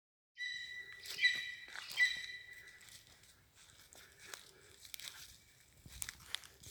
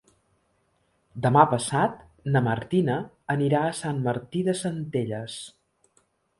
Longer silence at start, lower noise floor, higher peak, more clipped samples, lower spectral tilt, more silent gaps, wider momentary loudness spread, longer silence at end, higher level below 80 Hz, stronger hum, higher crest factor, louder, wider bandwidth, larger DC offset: second, 0.35 s vs 1.15 s; second, -65 dBFS vs -69 dBFS; second, -18 dBFS vs -2 dBFS; neither; second, 1 dB/octave vs -6 dB/octave; neither; first, 25 LU vs 15 LU; second, 0 s vs 0.9 s; second, -72 dBFS vs -60 dBFS; neither; about the same, 28 dB vs 24 dB; second, -39 LUFS vs -25 LUFS; first, over 20 kHz vs 11.5 kHz; neither